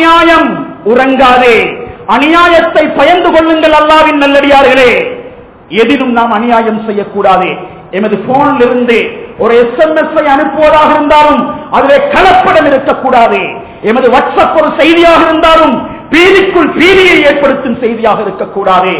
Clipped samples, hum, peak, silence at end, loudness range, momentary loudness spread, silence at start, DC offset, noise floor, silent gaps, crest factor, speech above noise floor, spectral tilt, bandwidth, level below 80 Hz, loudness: 10%; none; 0 dBFS; 0 s; 4 LU; 9 LU; 0 s; 0.4%; -28 dBFS; none; 6 dB; 22 dB; -8 dB/octave; 4 kHz; -34 dBFS; -6 LUFS